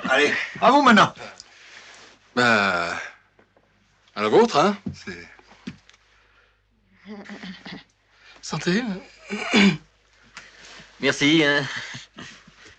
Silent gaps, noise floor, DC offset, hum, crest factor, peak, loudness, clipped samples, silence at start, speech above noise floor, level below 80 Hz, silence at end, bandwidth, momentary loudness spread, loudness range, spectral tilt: none; -62 dBFS; under 0.1%; none; 20 dB; -4 dBFS; -20 LUFS; under 0.1%; 0 s; 42 dB; -60 dBFS; 0.5 s; 9 kHz; 24 LU; 16 LU; -4.5 dB/octave